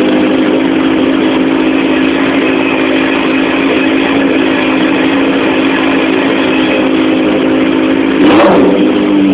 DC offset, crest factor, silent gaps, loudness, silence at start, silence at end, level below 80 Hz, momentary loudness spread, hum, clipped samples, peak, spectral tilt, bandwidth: under 0.1%; 8 dB; none; -9 LUFS; 0 s; 0 s; -40 dBFS; 3 LU; none; under 0.1%; 0 dBFS; -9.5 dB/octave; 4 kHz